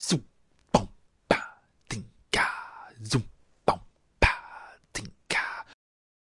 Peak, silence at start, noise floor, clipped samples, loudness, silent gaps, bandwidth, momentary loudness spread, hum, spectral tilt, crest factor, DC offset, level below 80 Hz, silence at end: -4 dBFS; 0 s; -48 dBFS; under 0.1%; -29 LUFS; none; 11.5 kHz; 19 LU; none; -4 dB/octave; 28 dB; under 0.1%; -44 dBFS; 0.8 s